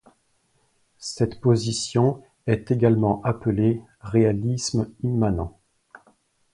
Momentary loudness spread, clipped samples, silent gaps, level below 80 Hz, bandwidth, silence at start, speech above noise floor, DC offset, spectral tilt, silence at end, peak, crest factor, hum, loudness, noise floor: 10 LU; under 0.1%; none; -46 dBFS; 11 kHz; 1 s; 45 dB; under 0.1%; -6.5 dB/octave; 1.05 s; -4 dBFS; 20 dB; none; -23 LUFS; -67 dBFS